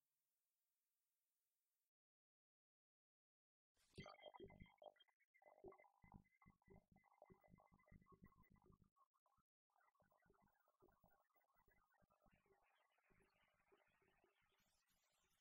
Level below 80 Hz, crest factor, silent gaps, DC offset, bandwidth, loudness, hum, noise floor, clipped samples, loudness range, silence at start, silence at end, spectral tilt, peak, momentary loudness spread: -84 dBFS; 26 dB; 1.87-3.75 s, 5.14-5.34 s, 8.91-8.96 s, 9.06-9.26 s, 9.41-9.70 s; under 0.1%; 16 kHz; -65 LUFS; none; under -90 dBFS; under 0.1%; 2 LU; 0.05 s; 0 s; -5.5 dB/octave; -48 dBFS; 6 LU